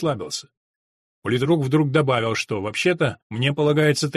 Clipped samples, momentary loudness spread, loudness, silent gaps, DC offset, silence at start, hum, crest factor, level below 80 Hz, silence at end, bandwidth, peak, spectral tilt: under 0.1%; 9 LU; -21 LUFS; 0.57-1.22 s, 3.22-3.30 s; under 0.1%; 0 s; none; 16 dB; -58 dBFS; 0 s; 13.5 kHz; -4 dBFS; -5.5 dB/octave